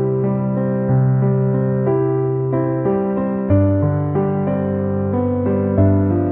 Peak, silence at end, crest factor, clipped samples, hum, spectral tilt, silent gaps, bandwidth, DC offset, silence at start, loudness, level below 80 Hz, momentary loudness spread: -4 dBFS; 0 s; 12 dB; under 0.1%; none; -15 dB/octave; none; 3.1 kHz; under 0.1%; 0 s; -18 LUFS; -46 dBFS; 4 LU